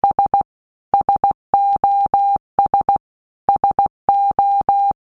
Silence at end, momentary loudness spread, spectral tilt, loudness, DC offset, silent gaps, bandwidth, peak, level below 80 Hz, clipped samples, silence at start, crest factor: 0.15 s; 5 LU; -8 dB/octave; -17 LUFS; under 0.1%; 0.45-0.92 s, 1.34-1.53 s, 2.40-2.58 s, 3.00-3.48 s, 3.90-4.08 s; 4.2 kHz; -2 dBFS; -48 dBFS; under 0.1%; 0.05 s; 14 dB